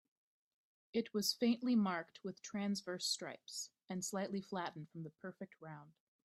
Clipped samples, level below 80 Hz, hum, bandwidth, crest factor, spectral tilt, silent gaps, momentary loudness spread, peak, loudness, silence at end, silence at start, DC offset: under 0.1%; -84 dBFS; none; 15.5 kHz; 20 dB; -4 dB/octave; none; 16 LU; -22 dBFS; -40 LUFS; 0.35 s; 0.95 s; under 0.1%